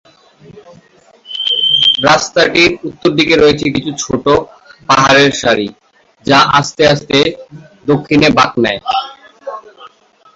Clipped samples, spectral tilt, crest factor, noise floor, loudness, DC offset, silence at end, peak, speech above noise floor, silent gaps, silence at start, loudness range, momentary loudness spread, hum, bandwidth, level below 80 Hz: under 0.1%; -4 dB/octave; 12 dB; -45 dBFS; -11 LUFS; under 0.1%; 0.5 s; 0 dBFS; 34 dB; none; 0.55 s; 2 LU; 20 LU; none; 8 kHz; -44 dBFS